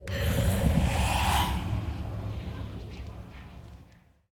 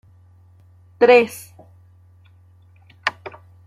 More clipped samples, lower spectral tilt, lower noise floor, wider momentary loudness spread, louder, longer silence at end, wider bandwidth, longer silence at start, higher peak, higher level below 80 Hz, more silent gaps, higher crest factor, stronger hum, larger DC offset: neither; about the same, -5 dB/octave vs -4 dB/octave; first, -57 dBFS vs -50 dBFS; second, 20 LU vs 26 LU; second, -29 LUFS vs -17 LUFS; about the same, 0.45 s vs 0.55 s; first, 19 kHz vs 15 kHz; second, 0 s vs 1 s; second, -12 dBFS vs -2 dBFS; first, -36 dBFS vs -68 dBFS; neither; about the same, 18 dB vs 20 dB; neither; neither